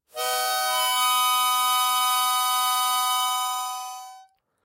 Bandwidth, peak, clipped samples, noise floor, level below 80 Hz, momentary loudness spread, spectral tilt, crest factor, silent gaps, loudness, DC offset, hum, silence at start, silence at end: 16 kHz; -10 dBFS; under 0.1%; -53 dBFS; -84 dBFS; 9 LU; 4.5 dB/octave; 14 dB; none; -22 LUFS; under 0.1%; none; 0.15 s; 0.4 s